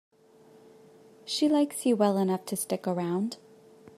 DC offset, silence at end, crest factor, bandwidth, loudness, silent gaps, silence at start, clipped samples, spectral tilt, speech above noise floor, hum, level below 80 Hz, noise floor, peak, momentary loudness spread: under 0.1%; 0.6 s; 20 dB; 14.5 kHz; -28 LUFS; none; 1.25 s; under 0.1%; -5 dB/octave; 30 dB; none; -78 dBFS; -57 dBFS; -10 dBFS; 10 LU